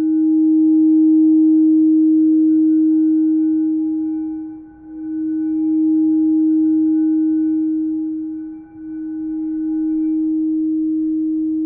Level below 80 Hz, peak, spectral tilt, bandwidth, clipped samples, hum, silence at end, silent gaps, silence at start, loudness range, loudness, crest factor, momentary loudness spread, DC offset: -56 dBFS; -8 dBFS; -12.5 dB/octave; 1.6 kHz; under 0.1%; none; 0 s; none; 0 s; 8 LU; -16 LUFS; 8 dB; 15 LU; under 0.1%